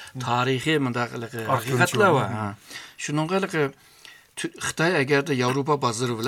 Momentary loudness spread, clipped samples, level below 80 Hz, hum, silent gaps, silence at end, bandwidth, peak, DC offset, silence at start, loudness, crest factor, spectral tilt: 13 LU; under 0.1%; -64 dBFS; none; none; 0 s; 17 kHz; -4 dBFS; under 0.1%; 0 s; -24 LUFS; 20 dB; -5 dB/octave